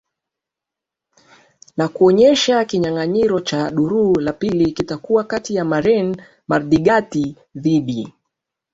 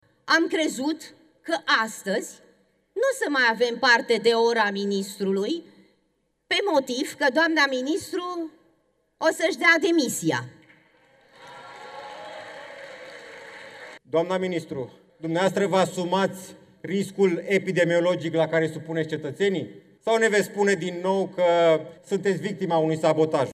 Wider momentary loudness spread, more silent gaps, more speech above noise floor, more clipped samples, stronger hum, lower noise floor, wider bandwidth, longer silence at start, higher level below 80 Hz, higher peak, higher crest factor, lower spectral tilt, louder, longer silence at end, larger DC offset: second, 12 LU vs 20 LU; neither; first, 69 dB vs 48 dB; neither; neither; first, -85 dBFS vs -71 dBFS; second, 7.8 kHz vs 15 kHz; first, 1.75 s vs 0.25 s; first, -50 dBFS vs -76 dBFS; first, -2 dBFS vs -6 dBFS; about the same, 16 dB vs 18 dB; about the same, -5.5 dB/octave vs -4.5 dB/octave; first, -17 LUFS vs -23 LUFS; first, 0.65 s vs 0 s; neither